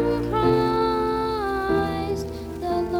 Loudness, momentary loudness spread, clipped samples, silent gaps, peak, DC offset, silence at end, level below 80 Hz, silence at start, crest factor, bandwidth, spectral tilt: -24 LUFS; 9 LU; under 0.1%; none; -8 dBFS; under 0.1%; 0 s; -40 dBFS; 0 s; 14 dB; 19 kHz; -7 dB/octave